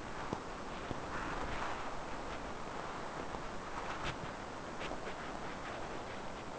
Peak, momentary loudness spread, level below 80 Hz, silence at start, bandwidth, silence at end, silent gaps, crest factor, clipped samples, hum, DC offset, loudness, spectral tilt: -22 dBFS; 4 LU; -54 dBFS; 0 s; 8 kHz; 0 s; none; 20 dB; under 0.1%; none; 0.2%; -43 LUFS; -4.5 dB/octave